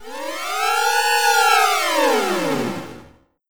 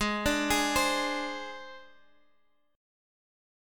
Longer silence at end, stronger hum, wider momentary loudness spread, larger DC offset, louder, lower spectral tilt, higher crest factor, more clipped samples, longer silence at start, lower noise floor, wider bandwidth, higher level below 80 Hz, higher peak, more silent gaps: second, 0 s vs 1 s; neither; second, 13 LU vs 17 LU; first, 1% vs under 0.1%; first, -17 LUFS vs -28 LUFS; about the same, -1.5 dB/octave vs -2.5 dB/octave; about the same, 18 dB vs 20 dB; neither; about the same, 0 s vs 0 s; second, -48 dBFS vs -71 dBFS; first, over 20 kHz vs 17.5 kHz; second, -64 dBFS vs -50 dBFS; first, -2 dBFS vs -14 dBFS; neither